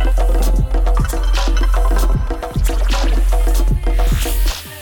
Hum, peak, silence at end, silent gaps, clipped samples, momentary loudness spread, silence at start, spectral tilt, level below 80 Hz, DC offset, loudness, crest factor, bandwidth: none; -4 dBFS; 0 s; none; under 0.1%; 3 LU; 0 s; -5 dB/octave; -14 dBFS; under 0.1%; -18 LUFS; 10 dB; 18.5 kHz